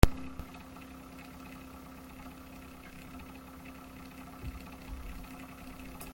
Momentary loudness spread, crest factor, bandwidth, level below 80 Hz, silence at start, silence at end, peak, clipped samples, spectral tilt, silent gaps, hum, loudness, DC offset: 4 LU; 34 dB; 17 kHz; -38 dBFS; 0 s; 0 s; -2 dBFS; under 0.1%; -6 dB/octave; none; none; -44 LUFS; under 0.1%